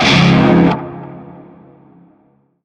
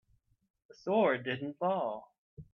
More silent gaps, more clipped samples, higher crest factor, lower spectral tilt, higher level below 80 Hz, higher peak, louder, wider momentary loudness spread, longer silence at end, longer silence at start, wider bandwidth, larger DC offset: second, none vs 2.18-2.37 s; neither; second, 14 dB vs 20 dB; second, -6 dB/octave vs -7.5 dB/octave; first, -40 dBFS vs -72 dBFS; first, 0 dBFS vs -16 dBFS; first, -11 LUFS vs -32 LUFS; first, 23 LU vs 13 LU; first, 1.4 s vs 0.1 s; second, 0 s vs 0.85 s; first, 9 kHz vs 6.8 kHz; neither